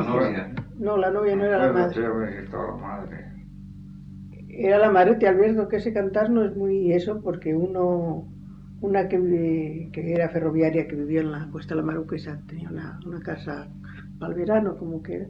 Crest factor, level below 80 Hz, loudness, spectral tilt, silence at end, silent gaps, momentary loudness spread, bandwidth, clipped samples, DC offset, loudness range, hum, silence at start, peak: 18 dB; -50 dBFS; -24 LUFS; -9.5 dB/octave; 0 s; none; 21 LU; 5.8 kHz; under 0.1%; under 0.1%; 9 LU; none; 0 s; -6 dBFS